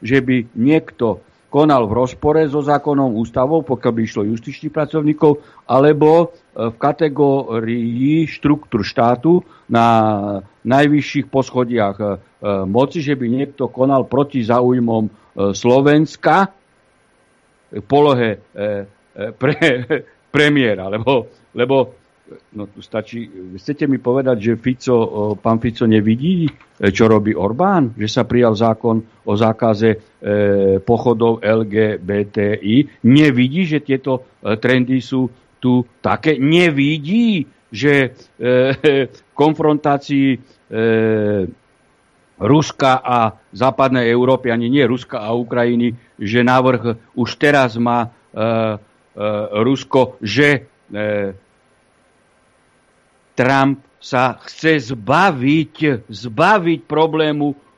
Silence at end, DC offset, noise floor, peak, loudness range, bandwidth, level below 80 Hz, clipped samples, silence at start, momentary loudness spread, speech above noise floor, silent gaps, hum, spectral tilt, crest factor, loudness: 0.25 s; under 0.1%; -56 dBFS; 0 dBFS; 3 LU; 10 kHz; -52 dBFS; under 0.1%; 0 s; 10 LU; 41 dB; none; none; -7 dB/octave; 16 dB; -16 LUFS